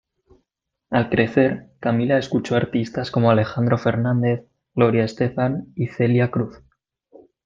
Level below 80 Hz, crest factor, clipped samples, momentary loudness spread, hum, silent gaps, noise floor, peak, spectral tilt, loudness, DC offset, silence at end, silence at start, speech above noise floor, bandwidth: -56 dBFS; 18 dB; under 0.1%; 8 LU; none; none; -79 dBFS; -2 dBFS; -8 dB/octave; -21 LUFS; under 0.1%; 0.9 s; 0.9 s; 59 dB; 7.4 kHz